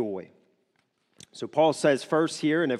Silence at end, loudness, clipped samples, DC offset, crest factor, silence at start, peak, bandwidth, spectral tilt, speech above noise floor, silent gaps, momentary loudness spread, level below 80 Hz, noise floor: 0 s; -25 LUFS; under 0.1%; under 0.1%; 18 dB; 0 s; -10 dBFS; 12.5 kHz; -5 dB/octave; 47 dB; none; 14 LU; -76 dBFS; -72 dBFS